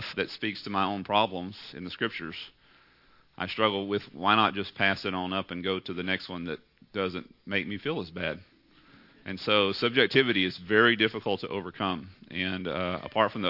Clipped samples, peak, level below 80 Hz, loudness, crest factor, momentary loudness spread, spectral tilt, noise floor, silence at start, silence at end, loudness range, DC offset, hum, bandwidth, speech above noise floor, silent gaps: under 0.1%; -6 dBFS; -68 dBFS; -28 LUFS; 24 dB; 16 LU; -6.5 dB/octave; -61 dBFS; 0 s; 0 s; 7 LU; under 0.1%; none; 5.8 kHz; 32 dB; none